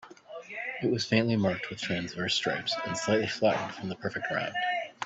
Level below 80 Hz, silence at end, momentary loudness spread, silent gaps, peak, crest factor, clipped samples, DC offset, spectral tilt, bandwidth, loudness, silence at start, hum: -66 dBFS; 0 s; 10 LU; none; -10 dBFS; 20 dB; under 0.1%; under 0.1%; -4.5 dB/octave; 8.4 kHz; -30 LUFS; 0 s; none